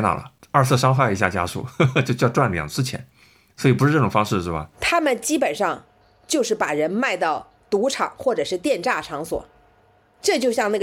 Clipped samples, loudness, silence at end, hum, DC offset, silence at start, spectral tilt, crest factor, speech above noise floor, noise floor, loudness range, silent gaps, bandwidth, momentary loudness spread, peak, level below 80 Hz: under 0.1%; -21 LUFS; 0 s; none; under 0.1%; 0 s; -5 dB/octave; 22 dB; 37 dB; -57 dBFS; 3 LU; none; 16 kHz; 10 LU; 0 dBFS; -50 dBFS